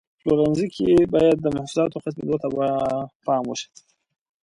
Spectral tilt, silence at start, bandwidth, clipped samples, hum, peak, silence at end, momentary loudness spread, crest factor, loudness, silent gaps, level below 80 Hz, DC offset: -6.5 dB/octave; 0.25 s; 11 kHz; under 0.1%; none; -6 dBFS; 0.8 s; 11 LU; 16 dB; -22 LUFS; 3.15-3.20 s; -52 dBFS; under 0.1%